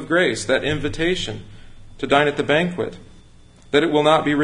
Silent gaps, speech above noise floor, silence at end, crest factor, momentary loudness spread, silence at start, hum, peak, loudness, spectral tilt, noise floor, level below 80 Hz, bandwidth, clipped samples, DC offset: none; 27 dB; 0 s; 18 dB; 13 LU; 0 s; none; -2 dBFS; -19 LUFS; -5 dB/octave; -46 dBFS; -44 dBFS; 11 kHz; under 0.1%; under 0.1%